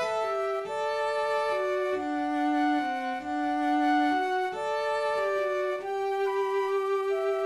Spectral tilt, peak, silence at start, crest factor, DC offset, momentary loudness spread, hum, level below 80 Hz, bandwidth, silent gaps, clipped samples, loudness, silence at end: -4 dB/octave; -16 dBFS; 0 s; 12 dB; under 0.1%; 5 LU; none; -70 dBFS; 13 kHz; none; under 0.1%; -28 LUFS; 0 s